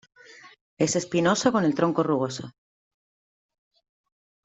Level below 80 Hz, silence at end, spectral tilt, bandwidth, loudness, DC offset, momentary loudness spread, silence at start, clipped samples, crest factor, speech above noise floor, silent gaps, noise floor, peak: -68 dBFS; 1.95 s; -5 dB/octave; 8.2 kHz; -24 LUFS; under 0.1%; 10 LU; 0.45 s; under 0.1%; 20 dB; over 67 dB; 0.61-0.77 s; under -90 dBFS; -6 dBFS